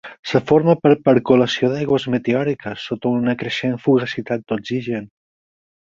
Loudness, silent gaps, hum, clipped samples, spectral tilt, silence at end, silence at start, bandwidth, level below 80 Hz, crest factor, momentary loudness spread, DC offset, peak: -19 LUFS; 0.19-0.23 s; none; under 0.1%; -7 dB/octave; 0.9 s; 0.05 s; 7.6 kHz; -56 dBFS; 18 dB; 10 LU; under 0.1%; -2 dBFS